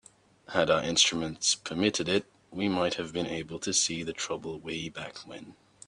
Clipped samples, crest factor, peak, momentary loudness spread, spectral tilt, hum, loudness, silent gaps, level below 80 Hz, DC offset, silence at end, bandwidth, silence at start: under 0.1%; 22 dB; -8 dBFS; 16 LU; -2.5 dB/octave; none; -29 LUFS; none; -64 dBFS; under 0.1%; 0.35 s; 10.5 kHz; 0.5 s